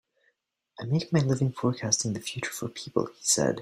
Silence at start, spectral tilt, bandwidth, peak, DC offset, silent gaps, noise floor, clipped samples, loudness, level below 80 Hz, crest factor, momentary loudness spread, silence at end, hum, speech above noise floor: 0.8 s; -4 dB/octave; 15.5 kHz; -8 dBFS; under 0.1%; none; -74 dBFS; under 0.1%; -28 LUFS; -62 dBFS; 20 dB; 9 LU; 0 s; none; 46 dB